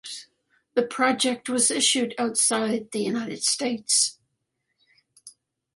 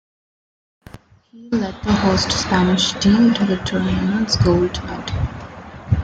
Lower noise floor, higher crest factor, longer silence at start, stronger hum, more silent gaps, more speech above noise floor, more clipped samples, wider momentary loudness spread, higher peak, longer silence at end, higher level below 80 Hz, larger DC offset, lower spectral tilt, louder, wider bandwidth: first, -78 dBFS vs -43 dBFS; about the same, 18 dB vs 16 dB; second, 0.05 s vs 1.35 s; neither; neither; first, 54 dB vs 25 dB; neither; second, 7 LU vs 12 LU; second, -8 dBFS vs -4 dBFS; first, 0.45 s vs 0 s; second, -74 dBFS vs -36 dBFS; neither; second, -1.5 dB/octave vs -5 dB/octave; second, -23 LUFS vs -18 LUFS; first, 12 kHz vs 9.2 kHz